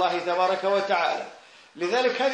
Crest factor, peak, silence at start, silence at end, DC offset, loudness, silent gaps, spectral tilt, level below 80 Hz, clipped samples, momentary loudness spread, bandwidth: 14 dB; -10 dBFS; 0 s; 0 s; under 0.1%; -25 LUFS; none; -3.5 dB/octave; -82 dBFS; under 0.1%; 9 LU; 10 kHz